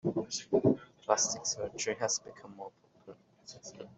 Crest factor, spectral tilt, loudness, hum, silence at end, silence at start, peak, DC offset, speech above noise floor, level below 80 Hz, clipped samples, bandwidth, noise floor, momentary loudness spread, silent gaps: 24 dB; -3.5 dB/octave; -32 LUFS; none; 0.05 s; 0.05 s; -10 dBFS; under 0.1%; 22 dB; -70 dBFS; under 0.1%; 8.2 kHz; -56 dBFS; 20 LU; none